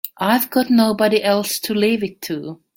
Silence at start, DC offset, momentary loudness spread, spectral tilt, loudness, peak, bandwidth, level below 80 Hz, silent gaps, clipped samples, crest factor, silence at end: 0.05 s; under 0.1%; 11 LU; -4.5 dB/octave; -18 LUFS; -2 dBFS; 17 kHz; -60 dBFS; none; under 0.1%; 16 dB; 0.25 s